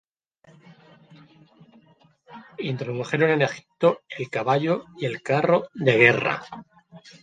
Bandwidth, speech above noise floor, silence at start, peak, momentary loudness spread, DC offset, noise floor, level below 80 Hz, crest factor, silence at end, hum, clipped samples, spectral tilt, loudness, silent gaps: 9.2 kHz; 35 dB; 2.3 s; -2 dBFS; 15 LU; under 0.1%; -58 dBFS; -68 dBFS; 24 dB; 0.25 s; none; under 0.1%; -6.5 dB/octave; -23 LUFS; none